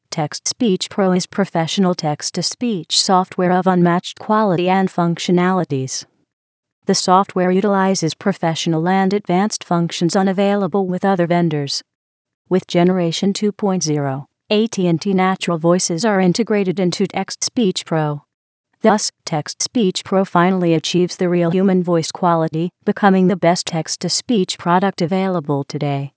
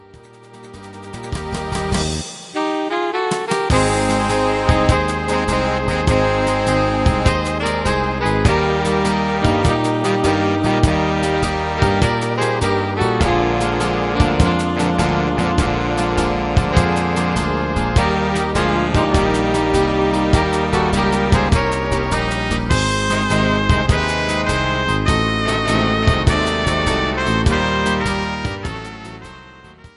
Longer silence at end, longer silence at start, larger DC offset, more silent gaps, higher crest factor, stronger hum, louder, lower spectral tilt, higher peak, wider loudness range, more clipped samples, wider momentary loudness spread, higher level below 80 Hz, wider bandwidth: about the same, 0.1 s vs 0.1 s; second, 0.1 s vs 0.4 s; neither; first, 6.33-6.63 s, 6.72-6.82 s, 11.95-12.25 s, 12.34-12.45 s, 18.34-18.64 s vs none; about the same, 18 dB vs 18 dB; neither; about the same, -17 LUFS vs -17 LUFS; about the same, -5 dB/octave vs -5.5 dB/octave; about the same, 0 dBFS vs 0 dBFS; about the same, 2 LU vs 2 LU; neither; about the same, 6 LU vs 5 LU; second, -68 dBFS vs -26 dBFS; second, 8 kHz vs 11.5 kHz